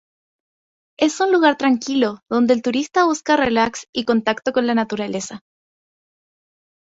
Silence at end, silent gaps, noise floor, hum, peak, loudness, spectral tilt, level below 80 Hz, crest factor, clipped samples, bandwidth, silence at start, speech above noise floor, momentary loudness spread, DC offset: 1.45 s; 3.89-3.93 s; under -90 dBFS; none; -2 dBFS; -19 LUFS; -4 dB/octave; -58 dBFS; 18 dB; under 0.1%; 8 kHz; 1 s; over 72 dB; 9 LU; under 0.1%